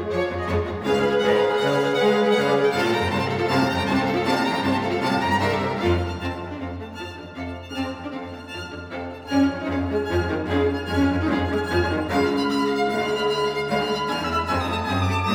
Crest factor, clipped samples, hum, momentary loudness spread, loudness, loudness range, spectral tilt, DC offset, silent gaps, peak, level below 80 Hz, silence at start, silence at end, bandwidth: 16 dB; under 0.1%; none; 13 LU; -22 LUFS; 7 LU; -6 dB/octave; under 0.1%; none; -8 dBFS; -44 dBFS; 0 s; 0 s; 19.5 kHz